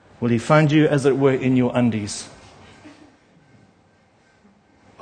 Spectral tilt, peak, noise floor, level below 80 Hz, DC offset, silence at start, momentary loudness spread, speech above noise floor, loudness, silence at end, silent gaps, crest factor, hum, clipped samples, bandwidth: -6.5 dB/octave; -2 dBFS; -57 dBFS; -58 dBFS; under 0.1%; 0.2 s; 13 LU; 39 dB; -19 LUFS; 2.1 s; none; 20 dB; none; under 0.1%; 9.8 kHz